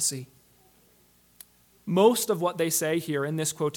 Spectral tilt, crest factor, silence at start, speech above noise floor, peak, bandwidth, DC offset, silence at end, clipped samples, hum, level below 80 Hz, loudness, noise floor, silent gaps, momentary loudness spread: -4 dB/octave; 20 dB; 0 s; 36 dB; -8 dBFS; 19 kHz; under 0.1%; 0 s; under 0.1%; 60 Hz at -55 dBFS; -72 dBFS; -25 LUFS; -61 dBFS; none; 8 LU